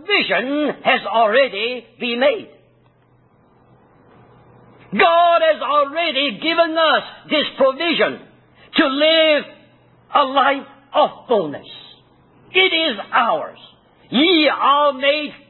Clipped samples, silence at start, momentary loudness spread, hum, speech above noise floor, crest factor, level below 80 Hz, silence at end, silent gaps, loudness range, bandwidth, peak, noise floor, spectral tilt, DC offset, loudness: under 0.1%; 0.05 s; 11 LU; none; 38 dB; 16 dB; -64 dBFS; 0.15 s; none; 4 LU; 4.3 kHz; -2 dBFS; -55 dBFS; -8.5 dB/octave; under 0.1%; -17 LUFS